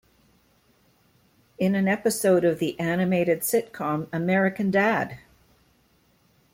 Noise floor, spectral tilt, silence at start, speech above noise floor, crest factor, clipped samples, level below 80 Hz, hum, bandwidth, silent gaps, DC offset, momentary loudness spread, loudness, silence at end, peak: -63 dBFS; -5.5 dB/octave; 1.6 s; 40 dB; 16 dB; under 0.1%; -64 dBFS; none; 16.5 kHz; none; under 0.1%; 7 LU; -24 LUFS; 1.35 s; -10 dBFS